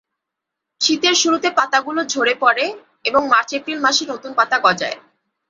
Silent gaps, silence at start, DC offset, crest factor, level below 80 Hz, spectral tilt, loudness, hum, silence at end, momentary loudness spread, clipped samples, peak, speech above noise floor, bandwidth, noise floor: none; 0.8 s; under 0.1%; 18 dB; -66 dBFS; -1 dB/octave; -17 LUFS; none; 0.5 s; 9 LU; under 0.1%; 0 dBFS; 64 dB; 7.8 kHz; -82 dBFS